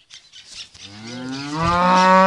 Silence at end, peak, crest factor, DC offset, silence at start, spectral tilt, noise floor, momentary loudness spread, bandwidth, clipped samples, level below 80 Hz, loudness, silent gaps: 0 s; 0 dBFS; 18 dB; under 0.1%; 0.15 s; -5 dB/octave; -44 dBFS; 23 LU; 11 kHz; under 0.1%; -46 dBFS; -18 LUFS; none